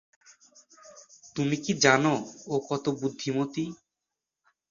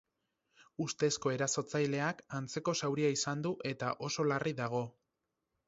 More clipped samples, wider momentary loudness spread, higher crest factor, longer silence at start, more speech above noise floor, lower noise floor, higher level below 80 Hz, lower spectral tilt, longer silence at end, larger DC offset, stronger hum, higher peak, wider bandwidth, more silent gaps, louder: neither; first, 12 LU vs 8 LU; first, 26 dB vs 18 dB; about the same, 0.85 s vs 0.8 s; first, 60 dB vs 52 dB; about the same, -87 dBFS vs -86 dBFS; first, -68 dBFS vs -74 dBFS; about the same, -4 dB/octave vs -4.5 dB/octave; first, 0.95 s vs 0.8 s; neither; neither; first, -4 dBFS vs -18 dBFS; about the same, 7.6 kHz vs 7.6 kHz; neither; first, -27 LUFS vs -35 LUFS